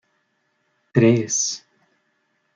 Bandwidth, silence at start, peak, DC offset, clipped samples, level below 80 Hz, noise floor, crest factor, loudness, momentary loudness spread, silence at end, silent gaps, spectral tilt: 9.6 kHz; 0.95 s; -2 dBFS; under 0.1%; under 0.1%; -62 dBFS; -69 dBFS; 22 dB; -19 LUFS; 9 LU; 1 s; none; -4.5 dB/octave